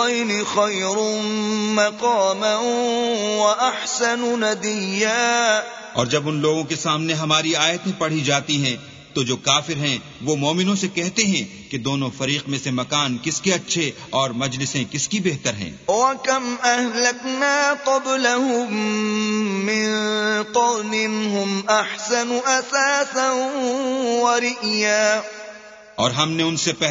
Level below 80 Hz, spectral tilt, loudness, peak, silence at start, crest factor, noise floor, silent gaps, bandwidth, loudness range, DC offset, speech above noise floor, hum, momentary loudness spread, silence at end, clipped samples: -62 dBFS; -3 dB/octave; -20 LUFS; -2 dBFS; 0 s; 20 dB; -41 dBFS; none; 7.8 kHz; 2 LU; under 0.1%; 20 dB; none; 5 LU; 0 s; under 0.1%